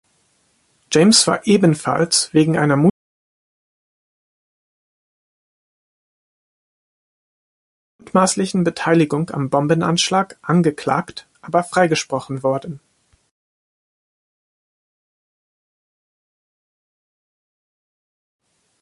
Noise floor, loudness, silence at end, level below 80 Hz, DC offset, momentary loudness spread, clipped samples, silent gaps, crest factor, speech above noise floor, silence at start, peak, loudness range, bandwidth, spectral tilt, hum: -62 dBFS; -17 LUFS; 6.05 s; -60 dBFS; under 0.1%; 8 LU; under 0.1%; 2.90-7.99 s; 20 dB; 46 dB; 0.9 s; 0 dBFS; 9 LU; 11.5 kHz; -4.5 dB/octave; none